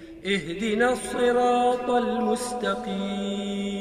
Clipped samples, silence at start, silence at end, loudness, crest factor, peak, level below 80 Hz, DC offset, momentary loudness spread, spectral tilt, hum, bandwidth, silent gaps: under 0.1%; 0 s; 0 s; -25 LUFS; 14 dB; -10 dBFS; -54 dBFS; under 0.1%; 8 LU; -4.5 dB/octave; none; 15 kHz; none